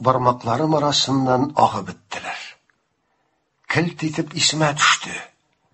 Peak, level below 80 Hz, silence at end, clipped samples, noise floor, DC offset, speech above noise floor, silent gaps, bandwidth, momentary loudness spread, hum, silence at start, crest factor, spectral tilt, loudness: 0 dBFS; -56 dBFS; 0.45 s; under 0.1%; -69 dBFS; under 0.1%; 49 dB; none; 8.6 kHz; 14 LU; none; 0 s; 22 dB; -3.5 dB/octave; -19 LUFS